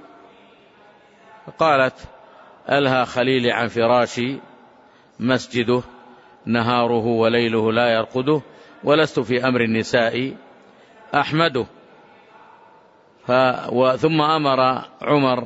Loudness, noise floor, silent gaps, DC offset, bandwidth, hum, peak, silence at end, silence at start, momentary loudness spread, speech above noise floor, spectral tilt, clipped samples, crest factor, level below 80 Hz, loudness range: -19 LUFS; -52 dBFS; none; under 0.1%; 8 kHz; none; -4 dBFS; 0 s; 1.45 s; 9 LU; 33 dB; -6 dB/octave; under 0.1%; 16 dB; -58 dBFS; 4 LU